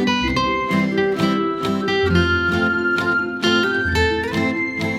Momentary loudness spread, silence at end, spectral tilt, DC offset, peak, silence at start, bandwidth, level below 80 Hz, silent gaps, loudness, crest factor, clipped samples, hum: 4 LU; 0 s; -5.5 dB/octave; under 0.1%; -4 dBFS; 0 s; 15.5 kHz; -36 dBFS; none; -19 LUFS; 14 dB; under 0.1%; none